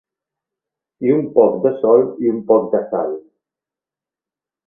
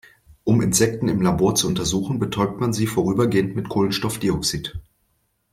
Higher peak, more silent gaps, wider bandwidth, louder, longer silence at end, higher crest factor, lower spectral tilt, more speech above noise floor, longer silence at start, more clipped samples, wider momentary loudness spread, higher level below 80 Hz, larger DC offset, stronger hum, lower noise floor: first, 0 dBFS vs -6 dBFS; neither; second, 3.6 kHz vs 16 kHz; first, -16 LUFS vs -21 LUFS; first, 1.45 s vs 0.7 s; about the same, 18 dB vs 16 dB; first, -13 dB/octave vs -5 dB/octave; first, 74 dB vs 48 dB; first, 1 s vs 0.3 s; neither; first, 9 LU vs 6 LU; second, -64 dBFS vs -44 dBFS; neither; neither; first, -89 dBFS vs -68 dBFS